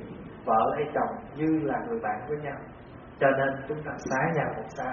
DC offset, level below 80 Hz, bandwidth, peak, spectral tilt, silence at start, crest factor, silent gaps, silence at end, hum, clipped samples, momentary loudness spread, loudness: under 0.1%; -56 dBFS; 6.4 kHz; -10 dBFS; -6 dB/octave; 0 s; 20 dB; none; 0 s; none; under 0.1%; 15 LU; -29 LUFS